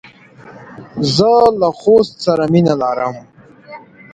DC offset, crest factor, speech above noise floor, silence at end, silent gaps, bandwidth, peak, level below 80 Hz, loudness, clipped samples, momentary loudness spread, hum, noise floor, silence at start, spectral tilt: under 0.1%; 16 dB; 27 dB; 0.35 s; none; 9.2 kHz; 0 dBFS; -50 dBFS; -13 LUFS; under 0.1%; 11 LU; none; -40 dBFS; 0.45 s; -6.5 dB/octave